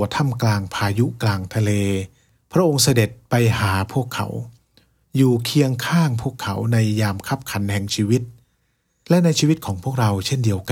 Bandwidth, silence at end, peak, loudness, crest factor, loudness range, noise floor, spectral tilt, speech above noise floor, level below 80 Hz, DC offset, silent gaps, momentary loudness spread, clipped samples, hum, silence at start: 16.5 kHz; 0 s; -4 dBFS; -20 LUFS; 16 dB; 2 LU; -67 dBFS; -5.5 dB/octave; 48 dB; -52 dBFS; under 0.1%; none; 9 LU; under 0.1%; none; 0 s